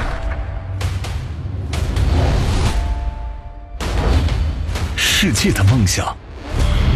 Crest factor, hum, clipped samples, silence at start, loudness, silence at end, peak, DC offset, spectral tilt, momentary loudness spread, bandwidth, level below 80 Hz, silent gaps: 14 dB; none; under 0.1%; 0 s; -19 LUFS; 0 s; -2 dBFS; under 0.1%; -4.5 dB/octave; 13 LU; 13 kHz; -22 dBFS; none